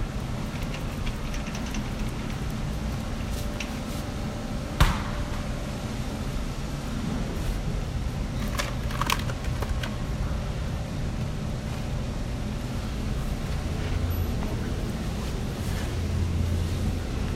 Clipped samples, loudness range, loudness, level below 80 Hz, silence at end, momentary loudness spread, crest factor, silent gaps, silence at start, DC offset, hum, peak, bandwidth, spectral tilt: under 0.1%; 2 LU; -31 LUFS; -32 dBFS; 0 s; 5 LU; 22 dB; none; 0 s; under 0.1%; none; -6 dBFS; 16 kHz; -5.5 dB/octave